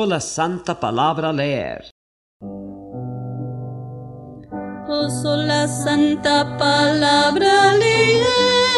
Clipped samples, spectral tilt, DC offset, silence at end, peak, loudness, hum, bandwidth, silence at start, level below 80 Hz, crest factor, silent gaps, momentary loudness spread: under 0.1%; -4 dB/octave; under 0.1%; 0 s; -4 dBFS; -17 LUFS; none; 12.5 kHz; 0 s; -52 dBFS; 14 dB; 1.91-2.40 s; 20 LU